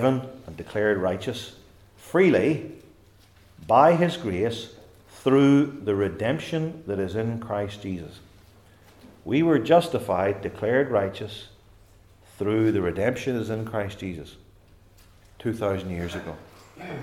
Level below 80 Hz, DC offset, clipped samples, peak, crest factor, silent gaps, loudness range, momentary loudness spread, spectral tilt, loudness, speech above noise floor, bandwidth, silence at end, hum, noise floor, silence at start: -58 dBFS; under 0.1%; under 0.1%; -4 dBFS; 22 dB; none; 8 LU; 19 LU; -7 dB/octave; -24 LUFS; 31 dB; 15.5 kHz; 0 s; none; -55 dBFS; 0 s